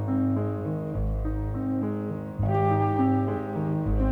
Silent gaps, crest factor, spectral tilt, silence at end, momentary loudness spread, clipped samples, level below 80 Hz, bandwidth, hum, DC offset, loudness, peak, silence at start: none; 14 dB; -11 dB/octave; 0 s; 7 LU; under 0.1%; -36 dBFS; 3.8 kHz; none; under 0.1%; -27 LUFS; -12 dBFS; 0 s